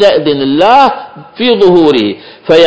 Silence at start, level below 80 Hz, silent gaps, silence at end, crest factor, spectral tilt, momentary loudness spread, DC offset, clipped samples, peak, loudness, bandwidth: 0 s; -46 dBFS; none; 0 s; 8 dB; -6 dB/octave; 15 LU; under 0.1%; 3%; 0 dBFS; -8 LUFS; 8 kHz